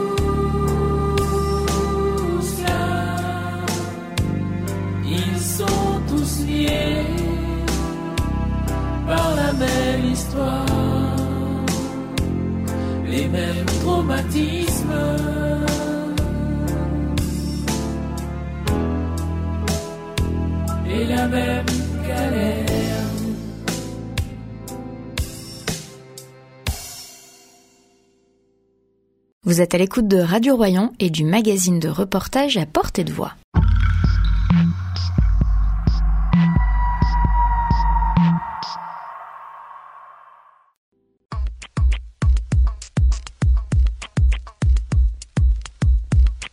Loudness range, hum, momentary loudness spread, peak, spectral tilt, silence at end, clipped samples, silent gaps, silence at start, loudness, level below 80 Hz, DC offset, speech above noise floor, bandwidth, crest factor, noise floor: 10 LU; none; 10 LU; -2 dBFS; -6 dB/octave; 0.05 s; under 0.1%; 29.32-29.41 s, 33.44-33.52 s, 40.77-40.92 s; 0 s; -21 LUFS; -24 dBFS; under 0.1%; 46 dB; 16 kHz; 18 dB; -63 dBFS